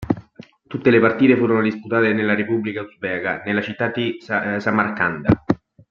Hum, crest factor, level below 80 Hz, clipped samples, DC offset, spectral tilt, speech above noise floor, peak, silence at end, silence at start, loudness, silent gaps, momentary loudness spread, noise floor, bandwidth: none; 18 dB; -50 dBFS; under 0.1%; under 0.1%; -8.5 dB/octave; 26 dB; -2 dBFS; 0.35 s; 0 s; -20 LUFS; none; 10 LU; -45 dBFS; 6.8 kHz